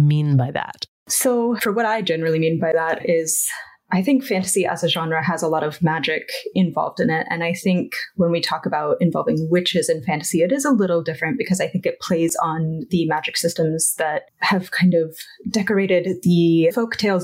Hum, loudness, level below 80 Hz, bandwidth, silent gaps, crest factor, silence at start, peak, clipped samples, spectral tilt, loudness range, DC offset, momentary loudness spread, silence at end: none; -20 LUFS; -62 dBFS; 16 kHz; 0.88-1.06 s; 12 dB; 0 s; -8 dBFS; under 0.1%; -4.5 dB/octave; 2 LU; under 0.1%; 5 LU; 0 s